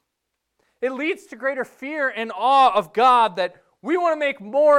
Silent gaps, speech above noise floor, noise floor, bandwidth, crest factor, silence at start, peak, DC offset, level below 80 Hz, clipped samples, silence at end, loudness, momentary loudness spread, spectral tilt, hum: none; 59 dB; -79 dBFS; 12.5 kHz; 14 dB; 0.8 s; -6 dBFS; under 0.1%; -68 dBFS; under 0.1%; 0 s; -21 LUFS; 13 LU; -4 dB/octave; none